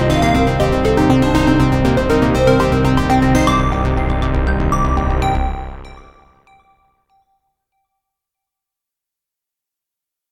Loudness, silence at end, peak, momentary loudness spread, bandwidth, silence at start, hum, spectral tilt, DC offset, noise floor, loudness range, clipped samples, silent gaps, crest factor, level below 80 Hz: -15 LUFS; 4.3 s; 0 dBFS; 5 LU; 15.5 kHz; 0 s; none; -6.5 dB/octave; under 0.1%; -84 dBFS; 11 LU; under 0.1%; none; 16 dB; -24 dBFS